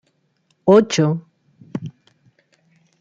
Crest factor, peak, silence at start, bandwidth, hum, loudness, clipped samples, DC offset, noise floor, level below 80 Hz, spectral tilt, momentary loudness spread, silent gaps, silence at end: 20 dB; -2 dBFS; 0.65 s; 9.2 kHz; none; -17 LUFS; under 0.1%; under 0.1%; -65 dBFS; -64 dBFS; -6 dB/octave; 19 LU; none; 1.1 s